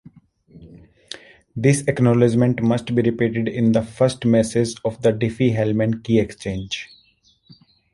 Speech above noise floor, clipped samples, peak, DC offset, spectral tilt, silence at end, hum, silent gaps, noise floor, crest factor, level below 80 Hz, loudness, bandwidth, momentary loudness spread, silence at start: 40 dB; under 0.1%; -2 dBFS; under 0.1%; -6.5 dB/octave; 1.1 s; none; none; -59 dBFS; 18 dB; -50 dBFS; -20 LUFS; 11.5 kHz; 13 LU; 0.55 s